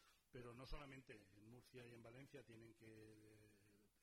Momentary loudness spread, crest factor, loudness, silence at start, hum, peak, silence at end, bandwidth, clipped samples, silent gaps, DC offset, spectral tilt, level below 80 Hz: 8 LU; 20 dB; -63 LUFS; 0 s; none; -42 dBFS; 0 s; 15.5 kHz; under 0.1%; none; under 0.1%; -5.5 dB/octave; -68 dBFS